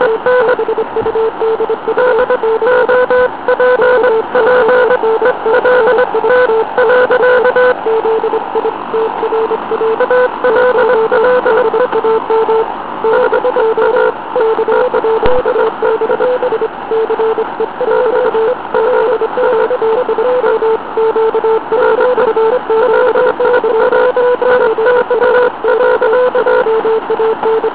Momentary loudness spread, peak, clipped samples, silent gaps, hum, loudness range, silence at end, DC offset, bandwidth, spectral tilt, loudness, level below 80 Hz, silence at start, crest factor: 5 LU; 0 dBFS; 0.2%; none; none; 3 LU; 0 s; 1%; 4 kHz; -8 dB/octave; -11 LUFS; -44 dBFS; 0 s; 10 dB